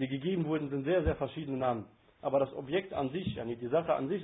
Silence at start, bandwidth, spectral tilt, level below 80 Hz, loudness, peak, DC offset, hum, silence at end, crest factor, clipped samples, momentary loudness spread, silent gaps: 0 s; 3.9 kHz; -5 dB/octave; -50 dBFS; -33 LUFS; -16 dBFS; under 0.1%; none; 0 s; 16 dB; under 0.1%; 7 LU; none